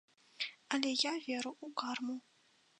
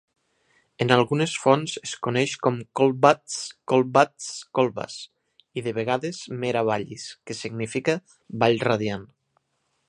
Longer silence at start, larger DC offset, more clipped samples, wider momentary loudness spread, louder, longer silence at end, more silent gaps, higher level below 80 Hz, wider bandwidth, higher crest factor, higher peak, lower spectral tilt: second, 0.4 s vs 0.8 s; neither; neither; second, 9 LU vs 15 LU; second, -38 LUFS vs -24 LUFS; second, 0.6 s vs 0.85 s; neither; second, under -90 dBFS vs -66 dBFS; about the same, 10 kHz vs 11 kHz; about the same, 24 dB vs 24 dB; second, -16 dBFS vs 0 dBFS; second, -1 dB/octave vs -5 dB/octave